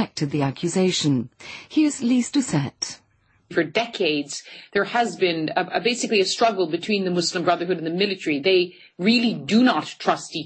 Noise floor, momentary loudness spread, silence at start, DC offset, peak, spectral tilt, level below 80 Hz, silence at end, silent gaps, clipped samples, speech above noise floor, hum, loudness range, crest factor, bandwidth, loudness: -52 dBFS; 8 LU; 0 s; under 0.1%; -6 dBFS; -4.5 dB/octave; -66 dBFS; 0 s; none; under 0.1%; 30 dB; none; 3 LU; 16 dB; 8.8 kHz; -22 LUFS